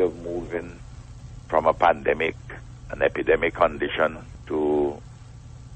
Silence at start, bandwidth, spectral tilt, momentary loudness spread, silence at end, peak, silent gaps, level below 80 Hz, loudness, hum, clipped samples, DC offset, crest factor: 0 s; 8.6 kHz; -6.5 dB/octave; 22 LU; 0 s; -6 dBFS; none; -44 dBFS; -24 LUFS; none; under 0.1%; under 0.1%; 20 dB